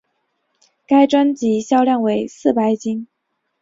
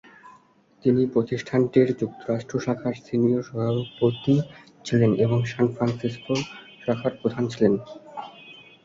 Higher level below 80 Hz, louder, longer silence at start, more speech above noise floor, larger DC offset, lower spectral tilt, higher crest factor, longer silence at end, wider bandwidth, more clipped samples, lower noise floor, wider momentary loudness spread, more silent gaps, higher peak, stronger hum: about the same, -62 dBFS vs -58 dBFS; first, -17 LUFS vs -24 LUFS; first, 0.9 s vs 0.25 s; first, 57 dB vs 33 dB; neither; second, -5.5 dB/octave vs -7.5 dB/octave; about the same, 16 dB vs 20 dB; first, 0.55 s vs 0.3 s; about the same, 7.8 kHz vs 7.6 kHz; neither; first, -73 dBFS vs -57 dBFS; second, 8 LU vs 16 LU; neither; first, -2 dBFS vs -6 dBFS; neither